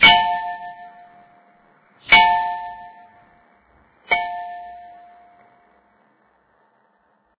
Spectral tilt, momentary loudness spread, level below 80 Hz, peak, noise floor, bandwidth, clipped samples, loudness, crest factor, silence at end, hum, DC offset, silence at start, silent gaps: -5 dB/octave; 28 LU; -52 dBFS; -2 dBFS; -63 dBFS; 4 kHz; under 0.1%; -17 LUFS; 22 dB; 2.5 s; none; under 0.1%; 0 s; none